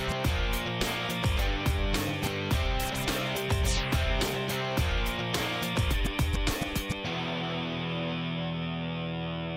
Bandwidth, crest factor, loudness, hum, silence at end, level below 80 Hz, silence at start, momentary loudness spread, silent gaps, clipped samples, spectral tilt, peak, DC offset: 16 kHz; 16 dB; -30 LUFS; none; 0 s; -34 dBFS; 0 s; 4 LU; none; under 0.1%; -4.5 dB/octave; -14 dBFS; under 0.1%